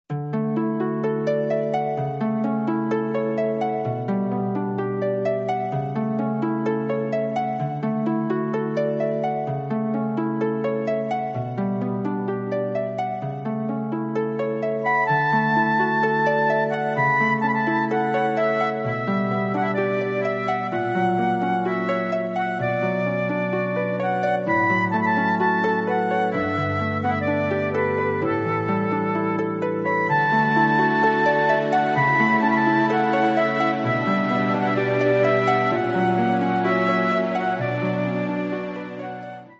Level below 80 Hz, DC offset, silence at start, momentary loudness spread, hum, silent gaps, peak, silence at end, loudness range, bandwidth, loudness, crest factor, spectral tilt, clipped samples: -58 dBFS; under 0.1%; 0.1 s; 7 LU; none; none; -6 dBFS; 0.05 s; 5 LU; 7.8 kHz; -22 LUFS; 16 dB; -8 dB/octave; under 0.1%